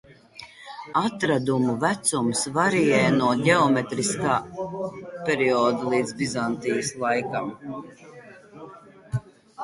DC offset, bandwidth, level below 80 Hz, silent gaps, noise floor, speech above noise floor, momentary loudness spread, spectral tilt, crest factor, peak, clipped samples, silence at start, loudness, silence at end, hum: under 0.1%; 11.5 kHz; -60 dBFS; none; -46 dBFS; 23 dB; 21 LU; -4.5 dB/octave; 20 dB; -4 dBFS; under 0.1%; 0.1 s; -24 LUFS; 0 s; none